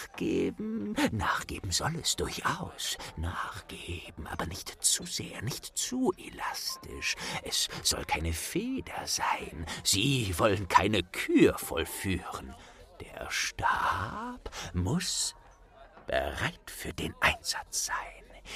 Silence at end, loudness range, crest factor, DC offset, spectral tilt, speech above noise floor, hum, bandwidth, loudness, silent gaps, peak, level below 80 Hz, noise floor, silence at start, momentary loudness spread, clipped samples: 0 s; 6 LU; 26 dB; under 0.1%; -3 dB/octave; 23 dB; none; 15.5 kHz; -31 LUFS; none; -6 dBFS; -50 dBFS; -55 dBFS; 0 s; 14 LU; under 0.1%